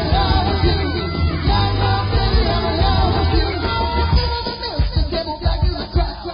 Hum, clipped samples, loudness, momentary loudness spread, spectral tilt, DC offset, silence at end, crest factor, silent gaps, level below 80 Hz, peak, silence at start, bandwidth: none; under 0.1%; -19 LUFS; 5 LU; -10.5 dB/octave; under 0.1%; 0 s; 14 dB; none; -20 dBFS; -4 dBFS; 0 s; 5.4 kHz